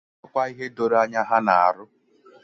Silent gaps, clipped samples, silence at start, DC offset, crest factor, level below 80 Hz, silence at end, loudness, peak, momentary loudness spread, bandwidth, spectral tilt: none; under 0.1%; 0.35 s; under 0.1%; 20 dB; -70 dBFS; 0.6 s; -22 LUFS; -4 dBFS; 10 LU; 7.6 kHz; -5.5 dB/octave